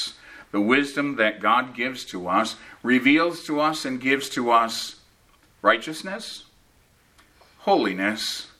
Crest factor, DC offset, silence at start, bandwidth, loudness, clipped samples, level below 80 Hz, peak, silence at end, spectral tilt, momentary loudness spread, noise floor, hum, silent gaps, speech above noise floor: 22 dB; under 0.1%; 0 s; 15 kHz; -23 LUFS; under 0.1%; -66 dBFS; -2 dBFS; 0.15 s; -3.5 dB/octave; 12 LU; -59 dBFS; none; none; 36 dB